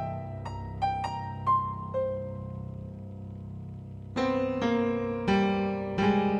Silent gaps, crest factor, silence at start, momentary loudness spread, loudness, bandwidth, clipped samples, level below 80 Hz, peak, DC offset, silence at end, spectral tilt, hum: none; 16 dB; 0 s; 15 LU; -30 LUFS; 8.8 kHz; under 0.1%; -52 dBFS; -14 dBFS; under 0.1%; 0 s; -7.5 dB/octave; none